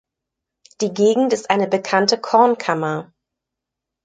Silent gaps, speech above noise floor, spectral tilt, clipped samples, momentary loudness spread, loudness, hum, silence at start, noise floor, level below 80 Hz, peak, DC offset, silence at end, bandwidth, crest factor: none; 66 dB; -4.5 dB/octave; under 0.1%; 10 LU; -18 LUFS; none; 0.8 s; -83 dBFS; -68 dBFS; -2 dBFS; under 0.1%; 1 s; 9.4 kHz; 18 dB